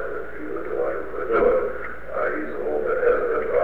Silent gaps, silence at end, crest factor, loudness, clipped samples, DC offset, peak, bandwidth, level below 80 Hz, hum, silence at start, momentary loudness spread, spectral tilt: none; 0 s; 16 dB; -24 LUFS; under 0.1%; 3%; -8 dBFS; 4.3 kHz; -44 dBFS; none; 0 s; 11 LU; -7.5 dB/octave